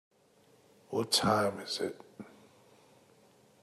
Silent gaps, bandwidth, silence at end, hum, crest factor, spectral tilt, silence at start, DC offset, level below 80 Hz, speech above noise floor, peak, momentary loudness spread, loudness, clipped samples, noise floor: none; 14 kHz; 1.35 s; none; 22 dB; -3.5 dB/octave; 0.9 s; under 0.1%; -72 dBFS; 34 dB; -14 dBFS; 25 LU; -31 LUFS; under 0.1%; -65 dBFS